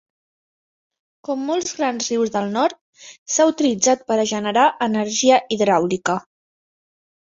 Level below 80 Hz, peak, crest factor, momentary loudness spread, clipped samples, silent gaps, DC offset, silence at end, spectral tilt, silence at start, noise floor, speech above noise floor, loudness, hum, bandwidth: -64 dBFS; -2 dBFS; 18 dB; 9 LU; under 0.1%; 2.81-2.93 s, 3.18-3.26 s; under 0.1%; 1.15 s; -3 dB/octave; 1.3 s; under -90 dBFS; over 71 dB; -19 LUFS; none; 7.8 kHz